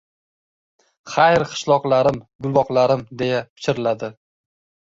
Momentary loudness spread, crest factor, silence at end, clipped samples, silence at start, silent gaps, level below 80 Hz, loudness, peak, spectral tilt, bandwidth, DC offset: 10 LU; 18 dB; 0.75 s; under 0.1%; 1.05 s; 2.35-2.39 s, 3.50-3.56 s; -56 dBFS; -19 LUFS; -2 dBFS; -5.5 dB/octave; 7.8 kHz; under 0.1%